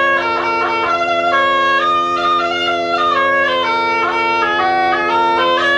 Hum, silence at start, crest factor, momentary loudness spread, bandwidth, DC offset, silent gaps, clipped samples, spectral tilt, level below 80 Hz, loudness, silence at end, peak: none; 0 s; 12 dB; 3 LU; 10.5 kHz; under 0.1%; none; under 0.1%; -3.5 dB/octave; -52 dBFS; -14 LUFS; 0 s; -4 dBFS